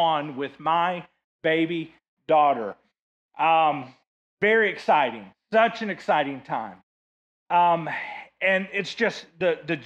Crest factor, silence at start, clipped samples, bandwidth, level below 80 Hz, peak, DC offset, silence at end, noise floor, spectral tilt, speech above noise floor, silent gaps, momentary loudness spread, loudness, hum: 16 dB; 0 s; under 0.1%; 8.8 kHz; -72 dBFS; -8 dBFS; under 0.1%; 0 s; under -90 dBFS; -5.5 dB/octave; over 67 dB; 1.24-1.39 s, 2.08-2.17 s, 2.99-3.29 s, 4.07-4.37 s, 6.83-7.46 s; 12 LU; -24 LUFS; none